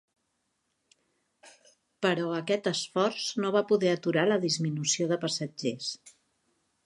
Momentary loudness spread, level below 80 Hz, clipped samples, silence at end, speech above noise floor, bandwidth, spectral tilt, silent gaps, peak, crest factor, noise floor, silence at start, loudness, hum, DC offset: 7 LU; -80 dBFS; under 0.1%; 0.75 s; 50 dB; 11.5 kHz; -4 dB/octave; none; -10 dBFS; 20 dB; -78 dBFS; 1.45 s; -28 LUFS; none; under 0.1%